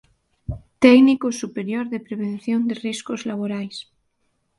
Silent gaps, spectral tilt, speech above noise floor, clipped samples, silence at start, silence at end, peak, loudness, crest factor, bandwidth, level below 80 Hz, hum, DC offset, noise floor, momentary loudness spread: none; -5.5 dB/octave; 50 dB; under 0.1%; 0.5 s; 0.8 s; 0 dBFS; -20 LUFS; 20 dB; 11.5 kHz; -48 dBFS; none; under 0.1%; -70 dBFS; 21 LU